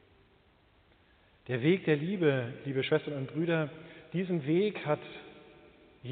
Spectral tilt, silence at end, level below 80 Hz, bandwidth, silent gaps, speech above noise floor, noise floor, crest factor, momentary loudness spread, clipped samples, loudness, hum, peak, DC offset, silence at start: -6 dB/octave; 0 s; -72 dBFS; 4.6 kHz; none; 34 dB; -65 dBFS; 20 dB; 18 LU; under 0.1%; -31 LUFS; none; -14 dBFS; under 0.1%; 1.5 s